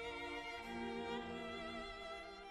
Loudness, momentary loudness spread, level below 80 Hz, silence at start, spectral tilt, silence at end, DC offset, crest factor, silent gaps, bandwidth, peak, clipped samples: -47 LUFS; 4 LU; -64 dBFS; 0 s; -4.5 dB/octave; 0 s; under 0.1%; 14 dB; none; 13 kHz; -32 dBFS; under 0.1%